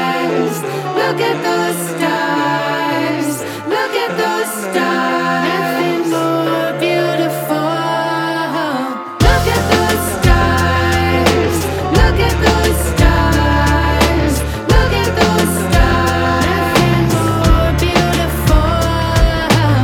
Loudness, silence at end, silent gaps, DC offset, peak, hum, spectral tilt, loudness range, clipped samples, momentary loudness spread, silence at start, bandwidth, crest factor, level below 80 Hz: -14 LUFS; 0 s; none; under 0.1%; 0 dBFS; none; -5 dB/octave; 3 LU; under 0.1%; 5 LU; 0 s; 18.5 kHz; 14 dB; -20 dBFS